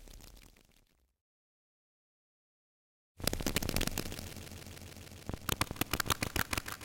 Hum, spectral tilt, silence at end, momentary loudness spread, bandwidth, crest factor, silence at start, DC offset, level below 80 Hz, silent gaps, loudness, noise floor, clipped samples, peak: none; -3 dB/octave; 0 s; 16 LU; 17 kHz; 28 dB; 0 s; under 0.1%; -48 dBFS; 1.21-3.15 s; -36 LUFS; -70 dBFS; under 0.1%; -12 dBFS